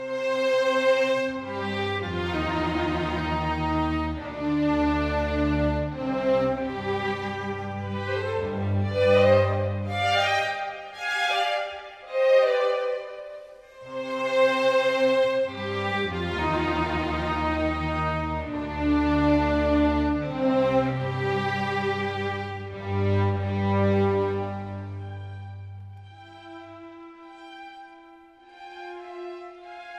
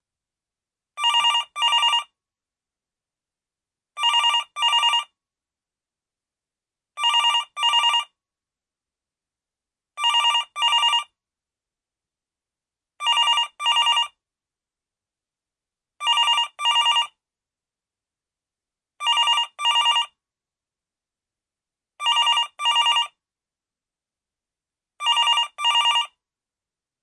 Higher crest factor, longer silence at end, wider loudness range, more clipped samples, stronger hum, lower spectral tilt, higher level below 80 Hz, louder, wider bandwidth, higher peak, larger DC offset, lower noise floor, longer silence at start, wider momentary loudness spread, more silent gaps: about the same, 18 dB vs 16 dB; second, 0 s vs 0.95 s; first, 12 LU vs 0 LU; neither; neither; first, -6.5 dB/octave vs 6 dB/octave; first, -40 dBFS vs -86 dBFS; second, -25 LUFS vs -19 LUFS; about the same, 11 kHz vs 11.5 kHz; about the same, -8 dBFS vs -8 dBFS; neither; second, -51 dBFS vs under -90 dBFS; second, 0 s vs 0.95 s; first, 19 LU vs 7 LU; neither